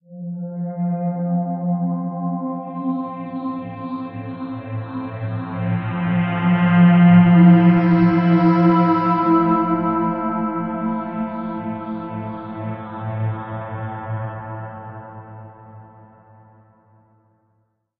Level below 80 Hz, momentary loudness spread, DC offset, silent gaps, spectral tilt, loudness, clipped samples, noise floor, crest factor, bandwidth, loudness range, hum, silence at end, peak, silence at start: -56 dBFS; 17 LU; under 0.1%; none; -11.5 dB/octave; -19 LUFS; under 0.1%; -67 dBFS; 18 dB; 4.2 kHz; 16 LU; none; 2.15 s; -2 dBFS; 0.1 s